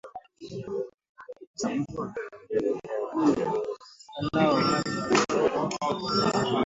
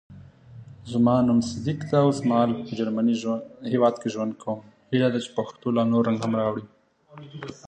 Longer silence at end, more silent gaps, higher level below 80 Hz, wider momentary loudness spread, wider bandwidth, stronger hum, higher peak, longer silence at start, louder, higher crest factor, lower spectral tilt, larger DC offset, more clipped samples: about the same, 0 s vs 0 s; first, 0.94-0.98 s, 1.09-1.15 s, 1.47-1.54 s vs none; about the same, -60 dBFS vs -58 dBFS; first, 18 LU vs 12 LU; second, 8 kHz vs 9 kHz; neither; second, -10 dBFS vs -6 dBFS; about the same, 0.05 s vs 0.1 s; second, -27 LUFS vs -24 LUFS; about the same, 18 dB vs 18 dB; second, -5 dB/octave vs -7 dB/octave; neither; neither